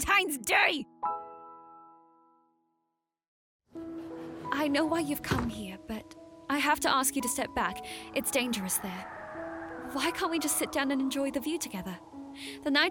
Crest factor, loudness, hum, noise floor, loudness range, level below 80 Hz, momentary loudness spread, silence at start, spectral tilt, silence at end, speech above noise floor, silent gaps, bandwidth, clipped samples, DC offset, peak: 22 dB; -30 LUFS; none; -82 dBFS; 10 LU; -56 dBFS; 17 LU; 0 s; -2.5 dB/octave; 0 s; 52 dB; 3.28-3.59 s; 18 kHz; under 0.1%; under 0.1%; -10 dBFS